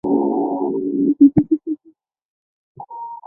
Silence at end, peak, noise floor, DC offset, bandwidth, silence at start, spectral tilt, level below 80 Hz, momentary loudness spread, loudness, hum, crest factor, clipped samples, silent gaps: 0.1 s; -2 dBFS; -54 dBFS; under 0.1%; 2.3 kHz; 0.05 s; -14.5 dB/octave; -54 dBFS; 19 LU; -17 LUFS; none; 18 dB; under 0.1%; 2.25-2.75 s